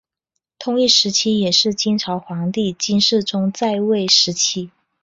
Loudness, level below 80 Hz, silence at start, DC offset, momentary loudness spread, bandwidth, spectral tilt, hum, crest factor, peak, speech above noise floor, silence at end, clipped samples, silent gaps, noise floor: -16 LUFS; -60 dBFS; 0.6 s; under 0.1%; 10 LU; 8 kHz; -3.5 dB/octave; none; 18 dB; -2 dBFS; 60 dB; 0.35 s; under 0.1%; none; -78 dBFS